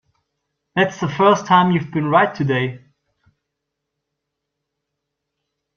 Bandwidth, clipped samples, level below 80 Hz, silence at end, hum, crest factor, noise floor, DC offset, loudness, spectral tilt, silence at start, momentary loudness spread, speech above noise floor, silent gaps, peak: 7 kHz; under 0.1%; -60 dBFS; 3 s; none; 20 dB; -79 dBFS; under 0.1%; -17 LUFS; -6 dB/octave; 0.75 s; 7 LU; 63 dB; none; -2 dBFS